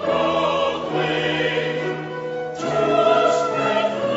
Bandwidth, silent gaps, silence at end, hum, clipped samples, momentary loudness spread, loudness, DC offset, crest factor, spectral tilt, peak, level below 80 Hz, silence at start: 8 kHz; none; 0 s; none; under 0.1%; 10 LU; -20 LUFS; under 0.1%; 16 dB; -5 dB/octave; -6 dBFS; -56 dBFS; 0 s